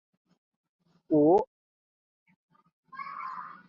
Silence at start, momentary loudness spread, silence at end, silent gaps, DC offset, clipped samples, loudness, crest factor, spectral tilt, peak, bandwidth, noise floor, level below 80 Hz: 1.1 s; 20 LU; 0.15 s; 1.47-2.26 s, 2.36-2.49 s, 2.73-2.83 s; under 0.1%; under 0.1%; -26 LUFS; 20 dB; -10 dB/octave; -12 dBFS; 5.6 kHz; under -90 dBFS; -74 dBFS